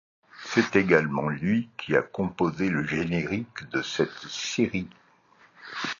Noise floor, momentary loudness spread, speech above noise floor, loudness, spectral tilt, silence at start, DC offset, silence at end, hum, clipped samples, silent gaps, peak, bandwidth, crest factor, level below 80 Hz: -59 dBFS; 11 LU; 33 dB; -27 LUFS; -5.5 dB/octave; 0.35 s; under 0.1%; 0.05 s; none; under 0.1%; none; -6 dBFS; 7.4 kHz; 22 dB; -56 dBFS